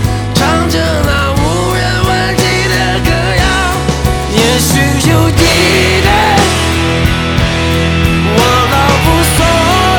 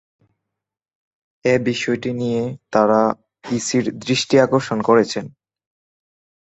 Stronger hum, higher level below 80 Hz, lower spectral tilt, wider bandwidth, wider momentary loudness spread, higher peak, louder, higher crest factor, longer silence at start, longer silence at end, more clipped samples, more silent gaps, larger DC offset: neither; first, -20 dBFS vs -60 dBFS; about the same, -4.5 dB/octave vs -5 dB/octave; first, over 20 kHz vs 8.2 kHz; second, 4 LU vs 9 LU; about the same, 0 dBFS vs -2 dBFS; first, -10 LUFS vs -19 LUFS; second, 10 dB vs 18 dB; second, 0 s vs 1.45 s; second, 0 s vs 1.15 s; neither; neither; neither